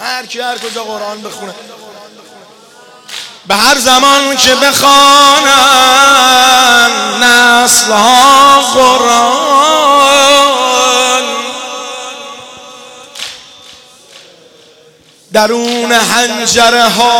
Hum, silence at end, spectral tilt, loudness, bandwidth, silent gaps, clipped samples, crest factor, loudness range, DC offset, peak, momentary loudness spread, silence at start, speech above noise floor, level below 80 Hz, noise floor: none; 0 s; -0.5 dB/octave; -6 LUFS; 18 kHz; none; 0.2%; 10 dB; 17 LU; under 0.1%; 0 dBFS; 19 LU; 0 s; 36 dB; -46 dBFS; -43 dBFS